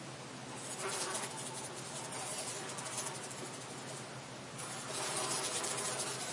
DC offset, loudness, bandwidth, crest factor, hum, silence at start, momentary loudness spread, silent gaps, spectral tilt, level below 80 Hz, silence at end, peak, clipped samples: under 0.1%; -39 LUFS; 11.5 kHz; 20 dB; none; 0 s; 10 LU; none; -2 dB/octave; -80 dBFS; 0 s; -20 dBFS; under 0.1%